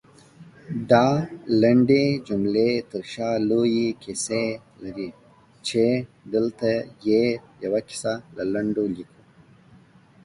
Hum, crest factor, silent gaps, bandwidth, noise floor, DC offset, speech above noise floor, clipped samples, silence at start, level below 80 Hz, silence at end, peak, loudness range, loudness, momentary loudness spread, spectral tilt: none; 20 dB; none; 11.5 kHz; -53 dBFS; under 0.1%; 30 dB; under 0.1%; 0.4 s; -60 dBFS; 1.2 s; -4 dBFS; 5 LU; -23 LUFS; 15 LU; -6 dB/octave